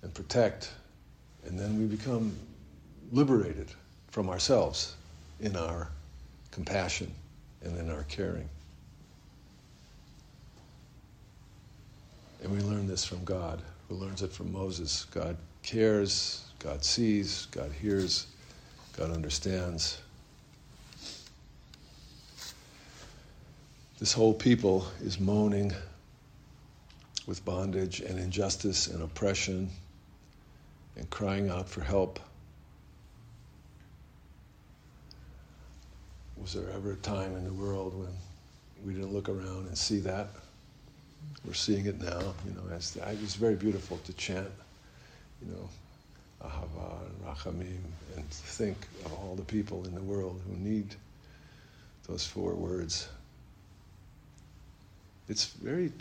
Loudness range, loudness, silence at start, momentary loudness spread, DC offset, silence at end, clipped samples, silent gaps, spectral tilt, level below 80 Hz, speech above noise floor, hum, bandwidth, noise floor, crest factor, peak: 12 LU; -33 LUFS; 0.05 s; 24 LU; under 0.1%; 0 s; under 0.1%; none; -4.5 dB/octave; -52 dBFS; 24 dB; none; 15.5 kHz; -57 dBFS; 24 dB; -12 dBFS